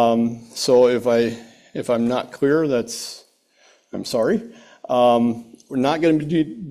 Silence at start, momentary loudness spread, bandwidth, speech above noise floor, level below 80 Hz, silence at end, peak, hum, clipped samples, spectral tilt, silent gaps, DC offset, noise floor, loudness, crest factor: 0 s; 16 LU; 14.5 kHz; 38 dB; -60 dBFS; 0 s; -4 dBFS; none; under 0.1%; -5.5 dB/octave; none; under 0.1%; -57 dBFS; -20 LUFS; 16 dB